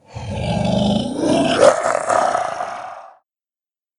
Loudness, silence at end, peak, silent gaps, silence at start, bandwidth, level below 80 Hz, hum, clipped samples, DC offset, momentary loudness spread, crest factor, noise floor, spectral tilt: -18 LUFS; 0.9 s; 0 dBFS; none; 0.1 s; 11 kHz; -42 dBFS; none; under 0.1%; under 0.1%; 16 LU; 18 dB; under -90 dBFS; -5 dB/octave